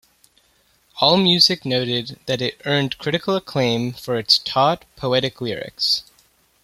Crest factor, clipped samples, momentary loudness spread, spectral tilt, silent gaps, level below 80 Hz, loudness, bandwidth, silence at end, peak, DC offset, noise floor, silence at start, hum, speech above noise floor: 20 dB; under 0.1%; 11 LU; -4.5 dB/octave; none; -58 dBFS; -19 LUFS; 16 kHz; 0.6 s; -2 dBFS; under 0.1%; -60 dBFS; 0.95 s; none; 40 dB